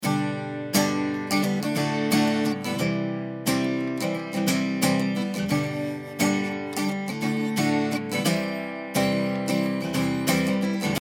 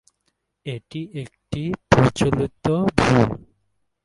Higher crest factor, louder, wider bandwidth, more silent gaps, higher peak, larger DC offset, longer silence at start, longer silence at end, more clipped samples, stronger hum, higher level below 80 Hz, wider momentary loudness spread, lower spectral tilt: about the same, 18 dB vs 22 dB; second, -25 LUFS vs -20 LUFS; first, 19.5 kHz vs 11.5 kHz; neither; second, -6 dBFS vs 0 dBFS; neither; second, 0 s vs 0.65 s; second, 0 s vs 0.65 s; neither; neither; second, -62 dBFS vs -42 dBFS; second, 5 LU vs 16 LU; second, -5 dB/octave vs -6.5 dB/octave